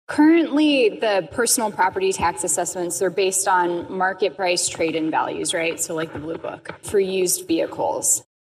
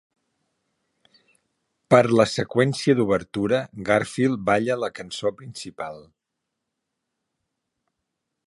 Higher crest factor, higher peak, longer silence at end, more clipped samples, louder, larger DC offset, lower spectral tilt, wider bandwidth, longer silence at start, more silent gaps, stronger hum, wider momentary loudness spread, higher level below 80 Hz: second, 14 dB vs 22 dB; second, -6 dBFS vs -2 dBFS; second, 0.25 s vs 2.45 s; neither; about the same, -20 LUFS vs -22 LUFS; neither; second, -2.5 dB/octave vs -6 dB/octave; first, 15.5 kHz vs 11.5 kHz; second, 0.1 s vs 1.9 s; neither; neither; second, 8 LU vs 16 LU; about the same, -56 dBFS vs -60 dBFS